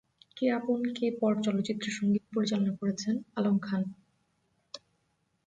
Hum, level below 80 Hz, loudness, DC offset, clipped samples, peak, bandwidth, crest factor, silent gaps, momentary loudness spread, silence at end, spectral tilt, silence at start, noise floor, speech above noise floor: none; -74 dBFS; -31 LUFS; under 0.1%; under 0.1%; -16 dBFS; 9 kHz; 16 dB; none; 10 LU; 0.7 s; -6 dB/octave; 0.35 s; -76 dBFS; 46 dB